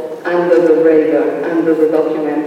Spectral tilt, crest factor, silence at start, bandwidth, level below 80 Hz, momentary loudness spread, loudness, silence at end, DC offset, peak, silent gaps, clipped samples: -7.5 dB/octave; 12 dB; 0 s; 7.8 kHz; -62 dBFS; 6 LU; -13 LUFS; 0 s; under 0.1%; -2 dBFS; none; under 0.1%